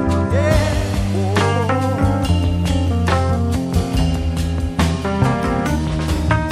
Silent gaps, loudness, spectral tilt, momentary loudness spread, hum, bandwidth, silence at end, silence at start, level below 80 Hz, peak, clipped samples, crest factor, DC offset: none; -18 LUFS; -6.5 dB/octave; 3 LU; none; 14 kHz; 0 s; 0 s; -26 dBFS; -2 dBFS; under 0.1%; 14 dB; under 0.1%